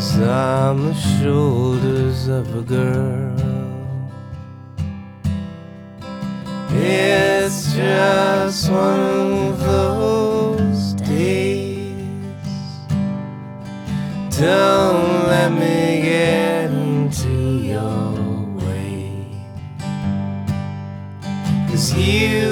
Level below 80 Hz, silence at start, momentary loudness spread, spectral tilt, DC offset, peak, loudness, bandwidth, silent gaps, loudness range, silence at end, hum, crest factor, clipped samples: -42 dBFS; 0 s; 14 LU; -6 dB/octave; under 0.1%; -4 dBFS; -19 LUFS; 18 kHz; none; 8 LU; 0 s; none; 16 dB; under 0.1%